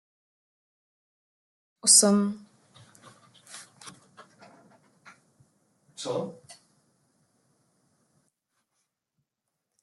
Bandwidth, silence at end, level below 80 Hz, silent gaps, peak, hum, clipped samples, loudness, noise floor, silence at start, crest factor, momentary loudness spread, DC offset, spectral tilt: 12.5 kHz; 3.5 s; -82 dBFS; none; -4 dBFS; none; under 0.1%; -21 LUFS; -84 dBFS; 1.85 s; 28 dB; 30 LU; under 0.1%; -2.5 dB/octave